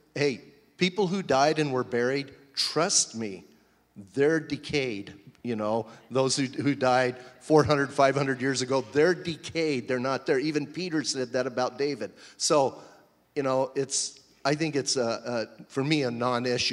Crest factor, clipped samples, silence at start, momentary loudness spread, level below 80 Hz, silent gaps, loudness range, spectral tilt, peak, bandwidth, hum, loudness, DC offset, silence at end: 20 dB; under 0.1%; 0.15 s; 10 LU; -64 dBFS; none; 4 LU; -4 dB/octave; -8 dBFS; 12.5 kHz; none; -27 LUFS; under 0.1%; 0 s